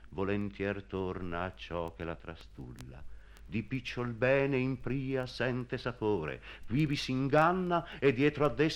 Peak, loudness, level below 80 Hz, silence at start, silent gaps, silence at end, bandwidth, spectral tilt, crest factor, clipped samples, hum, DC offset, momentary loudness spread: -14 dBFS; -33 LUFS; -54 dBFS; 0 s; none; 0 s; 14 kHz; -7 dB/octave; 20 dB; under 0.1%; none; under 0.1%; 17 LU